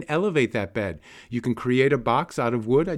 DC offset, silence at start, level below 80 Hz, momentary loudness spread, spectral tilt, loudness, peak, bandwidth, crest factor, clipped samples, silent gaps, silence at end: under 0.1%; 0 s; -52 dBFS; 10 LU; -7 dB/octave; -24 LUFS; -6 dBFS; 12.5 kHz; 16 dB; under 0.1%; none; 0 s